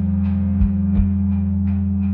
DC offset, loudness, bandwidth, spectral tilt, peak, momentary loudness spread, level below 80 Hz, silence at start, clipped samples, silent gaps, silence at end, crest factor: under 0.1%; -19 LUFS; 2.9 kHz; -12.5 dB/octave; -6 dBFS; 2 LU; -28 dBFS; 0 s; under 0.1%; none; 0 s; 12 dB